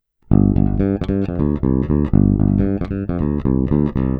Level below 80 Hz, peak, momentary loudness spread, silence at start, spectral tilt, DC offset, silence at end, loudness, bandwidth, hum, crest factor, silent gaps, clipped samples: -26 dBFS; 0 dBFS; 6 LU; 0.3 s; -12 dB/octave; under 0.1%; 0 s; -18 LUFS; 4.5 kHz; none; 16 dB; none; under 0.1%